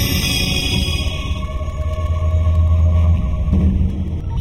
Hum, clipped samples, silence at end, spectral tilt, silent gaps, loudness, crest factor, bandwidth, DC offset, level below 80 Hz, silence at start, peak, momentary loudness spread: none; under 0.1%; 0 s; -5 dB/octave; none; -18 LUFS; 12 dB; 16 kHz; under 0.1%; -20 dBFS; 0 s; -4 dBFS; 9 LU